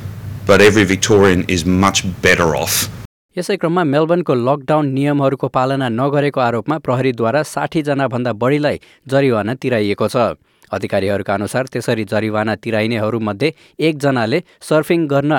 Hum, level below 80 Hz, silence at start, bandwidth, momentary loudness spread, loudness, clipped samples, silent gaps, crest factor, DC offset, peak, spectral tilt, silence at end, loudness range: none; -48 dBFS; 0 s; 19 kHz; 8 LU; -16 LUFS; under 0.1%; 3.05-3.29 s; 14 dB; under 0.1%; -2 dBFS; -5 dB/octave; 0 s; 5 LU